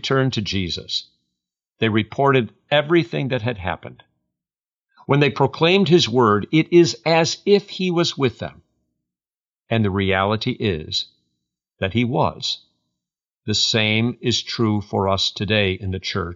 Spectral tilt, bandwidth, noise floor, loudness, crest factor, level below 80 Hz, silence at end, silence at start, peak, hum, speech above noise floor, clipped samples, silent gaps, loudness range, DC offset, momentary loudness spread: -5 dB/octave; 7.6 kHz; under -90 dBFS; -19 LUFS; 18 dB; -52 dBFS; 0 s; 0.05 s; -4 dBFS; none; over 71 dB; under 0.1%; 4.78-4.82 s, 9.48-9.57 s, 13.37-13.41 s; 6 LU; under 0.1%; 10 LU